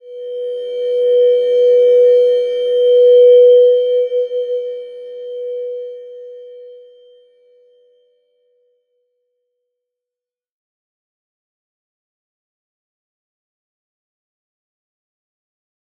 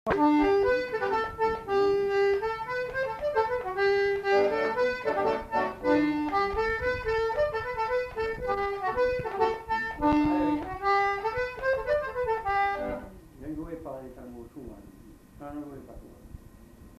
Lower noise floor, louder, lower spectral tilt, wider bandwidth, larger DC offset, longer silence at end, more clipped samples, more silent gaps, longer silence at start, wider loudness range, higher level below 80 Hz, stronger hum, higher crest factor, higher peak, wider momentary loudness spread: first, -88 dBFS vs -51 dBFS; first, -12 LUFS vs -27 LUFS; second, -2.5 dB/octave vs -6 dB/octave; second, 4.5 kHz vs 14 kHz; neither; first, 9.25 s vs 0.05 s; neither; neither; about the same, 0.05 s vs 0.05 s; first, 20 LU vs 9 LU; second, -88 dBFS vs -48 dBFS; neither; about the same, 14 dB vs 16 dB; first, -2 dBFS vs -12 dBFS; first, 22 LU vs 16 LU